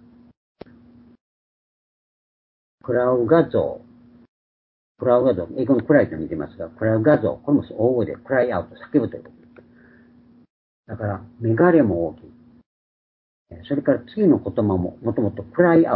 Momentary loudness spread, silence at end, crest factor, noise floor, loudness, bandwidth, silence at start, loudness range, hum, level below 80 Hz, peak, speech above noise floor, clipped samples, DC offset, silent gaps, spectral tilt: 12 LU; 0 s; 20 dB; -52 dBFS; -20 LUFS; 4.6 kHz; 2.85 s; 5 LU; none; -50 dBFS; -2 dBFS; 32 dB; under 0.1%; under 0.1%; 4.28-4.95 s, 10.50-10.83 s, 12.66-13.46 s; -13 dB/octave